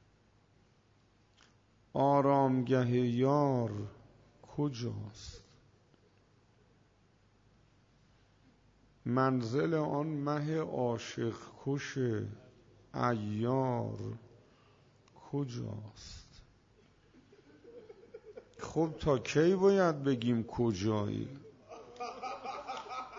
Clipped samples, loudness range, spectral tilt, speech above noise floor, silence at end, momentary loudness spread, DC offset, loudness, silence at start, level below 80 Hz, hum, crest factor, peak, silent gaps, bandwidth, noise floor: under 0.1%; 14 LU; -7 dB/octave; 36 dB; 0 s; 22 LU; under 0.1%; -33 LUFS; 1.95 s; -64 dBFS; none; 20 dB; -16 dBFS; none; 7.6 kHz; -68 dBFS